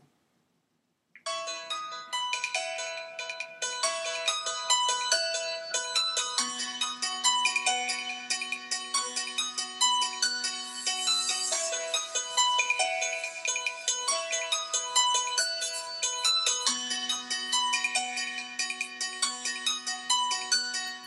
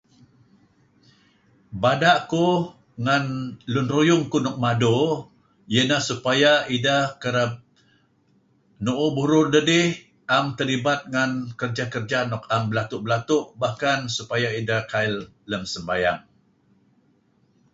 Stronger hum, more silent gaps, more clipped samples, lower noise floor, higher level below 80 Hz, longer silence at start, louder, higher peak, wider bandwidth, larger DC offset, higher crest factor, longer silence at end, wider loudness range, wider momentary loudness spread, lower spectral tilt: neither; neither; neither; first, -76 dBFS vs -62 dBFS; second, under -90 dBFS vs -58 dBFS; second, 1.15 s vs 1.7 s; second, -28 LUFS vs -22 LUFS; second, -10 dBFS vs -4 dBFS; first, 14.5 kHz vs 8 kHz; neither; about the same, 20 dB vs 20 dB; second, 0 s vs 1.55 s; about the same, 3 LU vs 4 LU; about the same, 8 LU vs 10 LU; second, 3 dB/octave vs -5 dB/octave